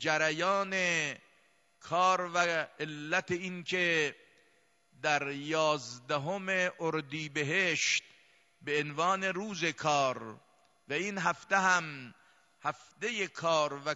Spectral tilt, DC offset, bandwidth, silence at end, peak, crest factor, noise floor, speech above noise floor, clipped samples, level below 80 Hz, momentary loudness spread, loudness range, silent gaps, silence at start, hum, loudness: -3 dB/octave; under 0.1%; 11.5 kHz; 0 s; -12 dBFS; 20 dB; -70 dBFS; 38 dB; under 0.1%; -80 dBFS; 10 LU; 2 LU; none; 0 s; none; -31 LUFS